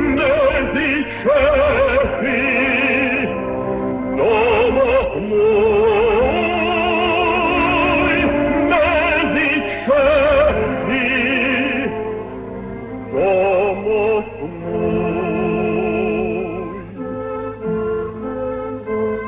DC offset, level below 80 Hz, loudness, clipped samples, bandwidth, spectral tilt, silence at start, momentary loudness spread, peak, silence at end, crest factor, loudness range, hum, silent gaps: under 0.1%; -36 dBFS; -17 LUFS; under 0.1%; 4 kHz; -9.5 dB/octave; 0 s; 11 LU; -4 dBFS; 0 s; 14 dB; 6 LU; none; none